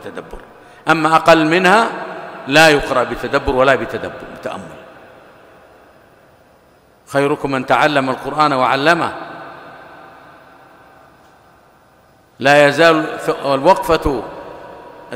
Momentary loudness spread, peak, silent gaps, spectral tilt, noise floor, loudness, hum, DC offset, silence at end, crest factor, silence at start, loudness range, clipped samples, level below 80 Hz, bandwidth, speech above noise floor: 21 LU; 0 dBFS; none; -4.5 dB/octave; -50 dBFS; -14 LUFS; none; under 0.1%; 0 s; 16 dB; 0 s; 12 LU; under 0.1%; -40 dBFS; 16 kHz; 36 dB